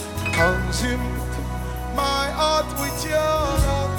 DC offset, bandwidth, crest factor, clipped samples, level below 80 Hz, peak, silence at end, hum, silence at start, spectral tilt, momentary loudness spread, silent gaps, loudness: under 0.1%; 19 kHz; 18 dB; under 0.1%; -30 dBFS; -4 dBFS; 0 s; none; 0 s; -4.5 dB/octave; 8 LU; none; -22 LUFS